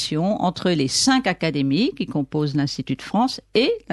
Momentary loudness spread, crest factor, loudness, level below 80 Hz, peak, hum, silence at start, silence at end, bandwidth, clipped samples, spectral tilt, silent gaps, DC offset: 6 LU; 14 dB; -21 LUFS; -54 dBFS; -6 dBFS; none; 0 s; 0 s; 12 kHz; under 0.1%; -4.5 dB/octave; none; under 0.1%